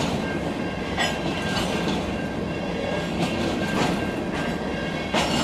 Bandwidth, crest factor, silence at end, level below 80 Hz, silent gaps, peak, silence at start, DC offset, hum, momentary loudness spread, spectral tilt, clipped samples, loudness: 15.5 kHz; 16 dB; 0 s; -42 dBFS; none; -10 dBFS; 0 s; under 0.1%; none; 4 LU; -5 dB/octave; under 0.1%; -26 LUFS